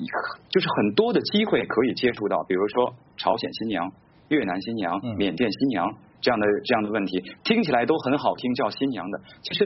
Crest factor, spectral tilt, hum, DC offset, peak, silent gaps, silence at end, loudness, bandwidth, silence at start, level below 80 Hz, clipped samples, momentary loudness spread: 18 dB; -3.5 dB/octave; none; under 0.1%; -6 dBFS; none; 0 s; -24 LUFS; 6 kHz; 0 s; -60 dBFS; under 0.1%; 7 LU